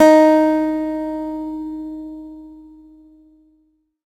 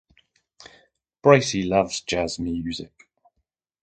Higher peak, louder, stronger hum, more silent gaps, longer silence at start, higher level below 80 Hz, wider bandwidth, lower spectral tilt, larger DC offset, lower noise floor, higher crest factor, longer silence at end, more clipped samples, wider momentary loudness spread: about the same, 0 dBFS vs 0 dBFS; first, -18 LUFS vs -22 LUFS; neither; neither; second, 0 s vs 1.25 s; about the same, -52 dBFS vs -50 dBFS; first, 13 kHz vs 9.2 kHz; about the same, -4.5 dB/octave vs -5 dB/octave; neither; second, -62 dBFS vs -77 dBFS; second, 18 dB vs 24 dB; first, 1.5 s vs 1 s; neither; first, 23 LU vs 15 LU